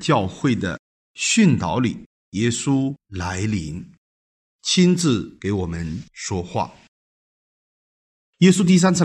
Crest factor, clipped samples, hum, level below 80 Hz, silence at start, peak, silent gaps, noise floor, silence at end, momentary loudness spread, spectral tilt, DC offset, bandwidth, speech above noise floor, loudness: 18 dB; under 0.1%; none; -52 dBFS; 0 s; -2 dBFS; 0.79-1.15 s, 2.06-2.32 s, 3.98-4.59 s, 6.88-8.33 s; under -90 dBFS; 0 s; 15 LU; -5 dB/octave; under 0.1%; 11.5 kHz; over 71 dB; -21 LUFS